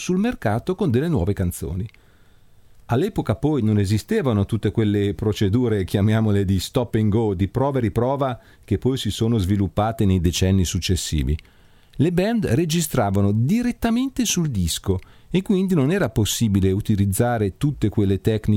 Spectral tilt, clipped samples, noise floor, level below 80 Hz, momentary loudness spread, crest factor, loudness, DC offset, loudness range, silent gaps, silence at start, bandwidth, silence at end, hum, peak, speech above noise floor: -6 dB/octave; under 0.1%; -51 dBFS; -38 dBFS; 5 LU; 16 dB; -21 LUFS; under 0.1%; 3 LU; none; 0 s; 16.5 kHz; 0 s; none; -6 dBFS; 31 dB